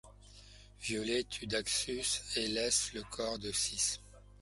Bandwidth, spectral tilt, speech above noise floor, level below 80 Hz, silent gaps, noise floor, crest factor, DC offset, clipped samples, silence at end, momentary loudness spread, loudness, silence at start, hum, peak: 12 kHz; -1.5 dB/octave; 20 dB; -58 dBFS; none; -56 dBFS; 20 dB; under 0.1%; under 0.1%; 0.1 s; 8 LU; -34 LUFS; 0.05 s; 50 Hz at -55 dBFS; -18 dBFS